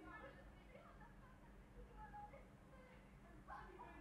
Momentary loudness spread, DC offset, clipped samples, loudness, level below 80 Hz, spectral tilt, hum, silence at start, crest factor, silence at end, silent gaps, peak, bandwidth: 7 LU; under 0.1%; under 0.1%; -61 LUFS; -66 dBFS; -6.5 dB/octave; none; 0 s; 16 dB; 0 s; none; -44 dBFS; 12.5 kHz